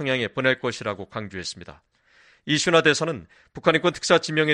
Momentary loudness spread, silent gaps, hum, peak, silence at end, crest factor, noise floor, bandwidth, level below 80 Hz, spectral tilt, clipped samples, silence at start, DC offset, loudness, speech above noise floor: 15 LU; none; none; -4 dBFS; 0 s; 20 dB; -58 dBFS; 10.5 kHz; -60 dBFS; -4 dB/octave; under 0.1%; 0 s; under 0.1%; -22 LUFS; 34 dB